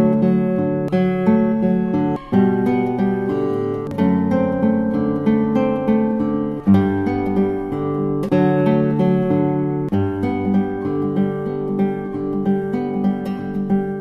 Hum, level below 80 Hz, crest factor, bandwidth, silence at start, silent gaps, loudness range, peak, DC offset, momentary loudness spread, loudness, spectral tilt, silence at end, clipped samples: none; -46 dBFS; 14 dB; 5.6 kHz; 0 s; none; 3 LU; -4 dBFS; under 0.1%; 6 LU; -19 LUFS; -10 dB/octave; 0 s; under 0.1%